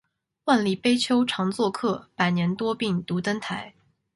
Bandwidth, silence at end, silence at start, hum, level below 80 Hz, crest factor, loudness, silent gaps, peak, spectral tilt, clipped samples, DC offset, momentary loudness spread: 11.5 kHz; 0.45 s; 0.45 s; none; -64 dBFS; 18 dB; -25 LUFS; none; -8 dBFS; -5.5 dB/octave; under 0.1%; under 0.1%; 10 LU